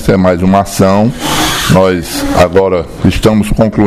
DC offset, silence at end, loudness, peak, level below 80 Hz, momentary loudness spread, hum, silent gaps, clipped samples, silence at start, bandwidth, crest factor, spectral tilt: under 0.1%; 0 s; -10 LUFS; 0 dBFS; -24 dBFS; 4 LU; none; none; 1%; 0 s; 16 kHz; 10 dB; -5.5 dB/octave